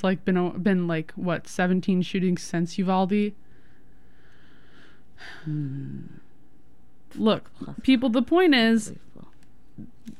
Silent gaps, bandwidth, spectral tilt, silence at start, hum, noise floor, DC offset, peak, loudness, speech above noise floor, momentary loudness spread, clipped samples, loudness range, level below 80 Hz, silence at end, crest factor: none; 12.5 kHz; -6 dB/octave; 0.05 s; none; -59 dBFS; 1%; -8 dBFS; -24 LUFS; 34 dB; 19 LU; under 0.1%; 15 LU; -58 dBFS; 0.1 s; 18 dB